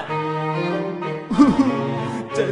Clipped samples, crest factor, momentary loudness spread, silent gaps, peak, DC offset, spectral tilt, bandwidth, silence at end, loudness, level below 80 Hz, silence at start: under 0.1%; 20 dB; 10 LU; none; -2 dBFS; under 0.1%; -7 dB/octave; 10.5 kHz; 0 s; -21 LUFS; -50 dBFS; 0 s